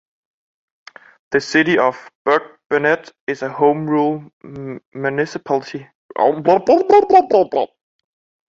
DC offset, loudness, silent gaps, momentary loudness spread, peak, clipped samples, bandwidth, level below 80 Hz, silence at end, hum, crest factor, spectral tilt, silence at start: under 0.1%; -17 LUFS; 2.15-2.25 s, 2.66-2.70 s, 3.20-3.27 s, 4.33-4.40 s, 4.85-4.92 s, 5.95-6.09 s; 19 LU; -2 dBFS; under 0.1%; 7.8 kHz; -60 dBFS; 0.8 s; none; 16 dB; -6 dB/octave; 1.3 s